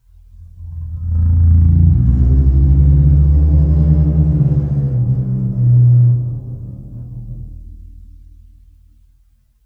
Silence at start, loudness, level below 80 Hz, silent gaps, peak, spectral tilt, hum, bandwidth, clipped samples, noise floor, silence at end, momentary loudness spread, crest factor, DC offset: 0.4 s; -13 LUFS; -18 dBFS; none; -2 dBFS; -13 dB/octave; none; 1.6 kHz; under 0.1%; -53 dBFS; 1.65 s; 20 LU; 12 dB; under 0.1%